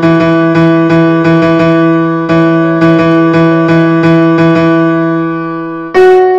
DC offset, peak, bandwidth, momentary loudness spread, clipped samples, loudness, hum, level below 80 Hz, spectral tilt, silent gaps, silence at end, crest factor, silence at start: under 0.1%; 0 dBFS; 7.6 kHz; 5 LU; 2%; -8 LUFS; none; -42 dBFS; -8.5 dB/octave; none; 0 s; 6 dB; 0 s